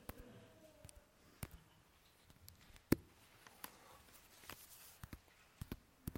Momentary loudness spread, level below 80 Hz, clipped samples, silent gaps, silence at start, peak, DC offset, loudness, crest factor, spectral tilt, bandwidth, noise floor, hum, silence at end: 26 LU; -62 dBFS; under 0.1%; none; 0 s; -16 dBFS; under 0.1%; -49 LUFS; 36 dB; -5.5 dB/octave; 16.5 kHz; -70 dBFS; none; 0 s